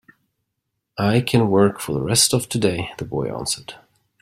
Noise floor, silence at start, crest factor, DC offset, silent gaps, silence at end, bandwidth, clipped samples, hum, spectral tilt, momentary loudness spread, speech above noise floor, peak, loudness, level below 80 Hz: -77 dBFS; 0.95 s; 18 dB; under 0.1%; none; 0.45 s; 16 kHz; under 0.1%; none; -4.5 dB/octave; 12 LU; 58 dB; -2 dBFS; -20 LUFS; -50 dBFS